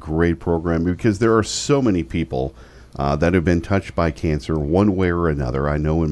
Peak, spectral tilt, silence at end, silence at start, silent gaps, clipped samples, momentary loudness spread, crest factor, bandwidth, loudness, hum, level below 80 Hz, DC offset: -2 dBFS; -6.5 dB/octave; 0 s; 0 s; none; under 0.1%; 6 LU; 16 dB; 11 kHz; -20 LUFS; none; -32 dBFS; under 0.1%